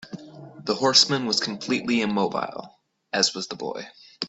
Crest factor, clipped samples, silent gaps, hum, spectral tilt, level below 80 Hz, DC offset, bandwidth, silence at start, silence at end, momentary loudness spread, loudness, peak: 22 dB; under 0.1%; none; none; -2.5 dB/octave; -68 dBFS; under 0.1%; 8.4 kHz; 0 s; 0 s; 23 LU; -23 LUFS; -2 dBFS